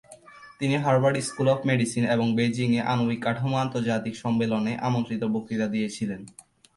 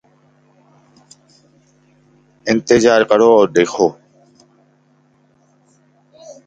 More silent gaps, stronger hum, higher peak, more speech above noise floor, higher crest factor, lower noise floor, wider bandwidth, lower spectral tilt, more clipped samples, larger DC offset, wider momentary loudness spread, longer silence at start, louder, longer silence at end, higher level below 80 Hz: neither; neither; second, -10 dBFS vs 0 dBFS; second, 24 dB vs 44 dB; about the same, 16 dB vs 18 dB; second, -48 dBFS vs -56 dBFS; first, 11.5 kHz vs 9 kHz; first, -6 dB/octave vs -4.5 dB/octave; neither; neither; about the same, 6 LU vs 8 LU; second, 0.1 s vs 2.45 s; second, -25 LUFS vs -13 LUFS; first, 0.45 s vs 0.15 s; about the same, -62 dBFS vs -58 dBFS